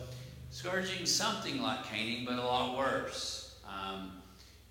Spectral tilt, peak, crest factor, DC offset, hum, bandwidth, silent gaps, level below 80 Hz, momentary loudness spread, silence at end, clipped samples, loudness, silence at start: -2.5 dB/octave; -18 dBFS; 18 dB; under 0.1%; none; 16.5 kHz; none; -60 dBFS; 16 LU; 0 s; under 0.1%; -35 LUFS; 0 s